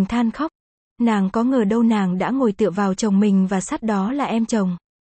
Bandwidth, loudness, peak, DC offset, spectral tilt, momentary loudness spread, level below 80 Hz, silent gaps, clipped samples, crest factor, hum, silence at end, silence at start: 8.8 kHz; -20 LUFS; -8 dBFS; under 0.1%; -6.5 dB/octave; 5 LU; -52 dBFS; 0.55-0.96 s; under 0.1%; 12 dB; none; 0.25 s; 0 s